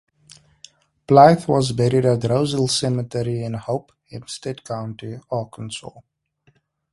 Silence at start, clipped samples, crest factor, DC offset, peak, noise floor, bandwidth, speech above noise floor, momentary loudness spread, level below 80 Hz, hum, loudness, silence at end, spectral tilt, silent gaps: 1.1 s; under 0.1%; 20 dB; under 0.1%; 0 dBFS; -62 dBFS; 11.5 kHz; 42 dB; 20 LU; -54 dBFS; none; -19 LUFS; 0.95 s; -6 dB/octave; none